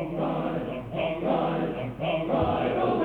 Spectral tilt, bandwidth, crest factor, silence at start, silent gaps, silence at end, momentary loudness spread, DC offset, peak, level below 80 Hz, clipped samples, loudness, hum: -9 dB/octave; 5 kHz; 14 dB; 0 s; none; 0 s; 6 LU; under 0.1%; -12 dBFS; -48 dBFS; under 0.1%; -28 LUFS; none